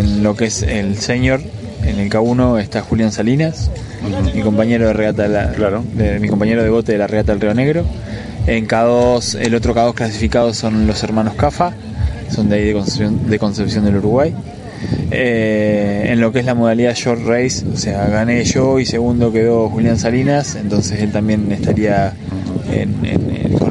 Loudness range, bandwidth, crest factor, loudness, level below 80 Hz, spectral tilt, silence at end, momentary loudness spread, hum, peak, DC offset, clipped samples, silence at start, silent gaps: 2 LU; 11 kHz; 14 dB; -15 LUFS; -30 dBFS; -6 dB/octave; 0 s; 6 LU; none; 0 dBFS; under 0.1%; under 0.1%; 0 s; none